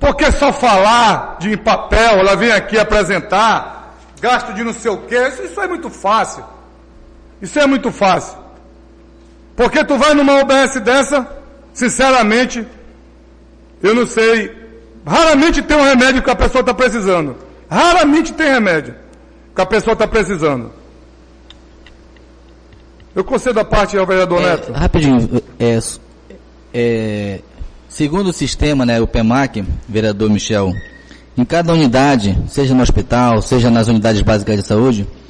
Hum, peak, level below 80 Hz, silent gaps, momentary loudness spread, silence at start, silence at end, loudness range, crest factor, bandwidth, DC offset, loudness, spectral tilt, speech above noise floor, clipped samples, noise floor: none; -2 dBFS; -28 dBFS; none; 12 LU; 0 s; 0.15 s; 7 LU; 12 dB; 10 kHz; under 0.1%; -13 LUFS; -5 dB/octave; 29 dB; under 0.1%; -42 dBFS